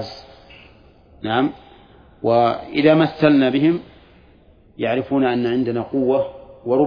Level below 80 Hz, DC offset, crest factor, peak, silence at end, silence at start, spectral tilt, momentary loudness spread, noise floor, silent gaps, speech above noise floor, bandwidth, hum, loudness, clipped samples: -54 dBFS; under 0.1%; 18 dB; 0 dBFS; 0 s; 0 s; -8.5 dB/octave; 12 LU; -50 dBFS; none; 33 dB; 5.2 kHz; none; -19 LUFS; under 0.1%